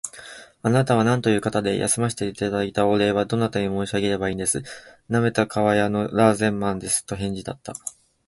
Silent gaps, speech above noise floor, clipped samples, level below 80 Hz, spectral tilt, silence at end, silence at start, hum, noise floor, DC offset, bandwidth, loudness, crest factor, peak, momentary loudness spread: none; 21 dB; under 0.1%; -50 dBFS; -5 dB/octave; 0.35 s; 0.05 s; none; -43 dBFS; under 0.1%; 12 kHz; -22 LUFS; 20 dB; -2 dBFS; 14 LU